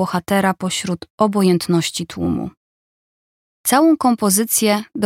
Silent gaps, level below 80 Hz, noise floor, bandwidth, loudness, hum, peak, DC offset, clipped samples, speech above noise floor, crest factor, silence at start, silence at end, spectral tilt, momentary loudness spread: 1.10-1.18 s, 2.57-3.64 s; -52 dBFS; under -90 dBFS; 17 kHz; -17 LUFS; none; 0 dBFS; under 0.1%; under 0.1%; over 73 dB; 18 dB; 0 s; 0 s; -4.5 dB/octave; 9 LU